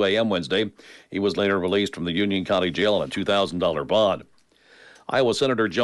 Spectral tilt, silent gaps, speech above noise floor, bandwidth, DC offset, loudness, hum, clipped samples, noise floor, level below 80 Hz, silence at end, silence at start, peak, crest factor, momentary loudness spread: -5 dB/octave; none; 32 dB; 11.5 kHz; under 0.1%; -23 LUFS; none; under 0.1%; -55 dBFS; -58 dBFS; 0 s; 0 s; -10 dBFS; 14 dB; 5 LU